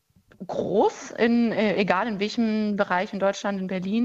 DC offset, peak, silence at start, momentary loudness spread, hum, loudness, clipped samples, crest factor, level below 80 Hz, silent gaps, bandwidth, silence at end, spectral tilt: under 0.1%; -4 dBFS; 0.4 s; 7 LU; none; -24 LUFS; under 0.1%; 20 dB; -62 dBFS; none; 7.8 kHz; 0 s; -6 dB/octave